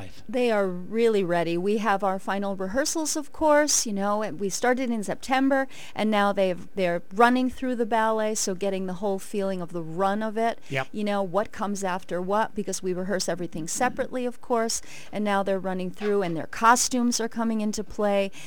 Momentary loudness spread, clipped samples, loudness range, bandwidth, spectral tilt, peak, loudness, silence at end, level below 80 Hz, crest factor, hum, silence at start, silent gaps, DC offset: 9 LU; under 0.1%; 4 LU; 19 kHz; -4 dB/octave; -6 dBFS; -26 LUFS; 0 s; -56 dBFS; 20 dB; none; 0 s; none; 2%